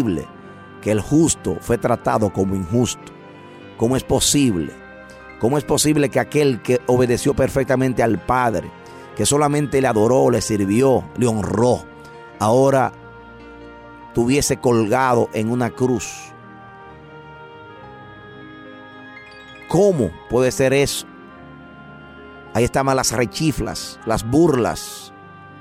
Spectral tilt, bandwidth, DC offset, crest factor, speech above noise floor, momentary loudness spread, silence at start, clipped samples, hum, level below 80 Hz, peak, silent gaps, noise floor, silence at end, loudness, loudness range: -5 dB/octave; 16 kHz; under 0.1%; 14 dB; 23 dB; 23 LU; 0 s; under 0.1%; none; -42 dBFS; -6 dBFS; none; -41 dBFS; 0 s; -18 LUFS; 6 LU